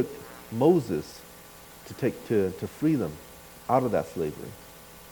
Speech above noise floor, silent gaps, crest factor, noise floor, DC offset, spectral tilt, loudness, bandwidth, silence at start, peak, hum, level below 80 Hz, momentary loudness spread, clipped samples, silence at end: 22 dB; none; 20 dB; -48 dBFS; under 0.1%; -7 dB/octave; -27 LUFS; 19 kHz; 0 s; -8 dBFS; none; -58 dBFS; 23 LU; under 0.1%; 0 s